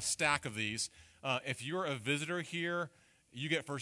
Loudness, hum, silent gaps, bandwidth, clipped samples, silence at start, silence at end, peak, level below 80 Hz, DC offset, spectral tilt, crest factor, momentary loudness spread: -36 LUFS; none; none; 11.5 kHz; under 0.1%; 0 s; 0 s; -16 dBFS; -72 dBFS; under 0.1%; -3 dB/octave; 22 dB; 10 LU